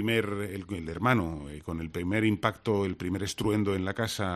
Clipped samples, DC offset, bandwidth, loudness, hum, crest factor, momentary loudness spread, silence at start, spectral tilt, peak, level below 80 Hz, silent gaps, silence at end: under 0.1%; under 0.1%; 13.5 kHz; -30 LUFS; none; 22 dB; 10 LU; 0 s; -5.5 dB/octave; -8 dBFS; -54 dBFS; none; 0 s